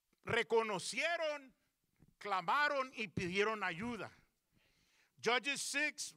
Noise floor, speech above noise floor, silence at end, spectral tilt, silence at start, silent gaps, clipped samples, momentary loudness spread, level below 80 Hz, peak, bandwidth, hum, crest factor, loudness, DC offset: -77 dBFS; 39 dB; 0.05 s; -3 dB/octave; 0.25 s; none; under 0.1%; 10 LU; -74 dBFS; -20 dBFS; 16 kHz; none; 20 dB; -37 LUFS; under 0.1%